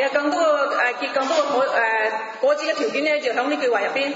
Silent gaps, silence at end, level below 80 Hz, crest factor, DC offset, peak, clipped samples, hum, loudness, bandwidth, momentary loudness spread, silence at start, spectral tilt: none; 0 s; -82 dBFS; 14 dB; under 0.1%; -6 dBFS; under 0.1%; none; -20 LUFS; 7.8 kHz; 3 LU; 0 s; -2 dB/octave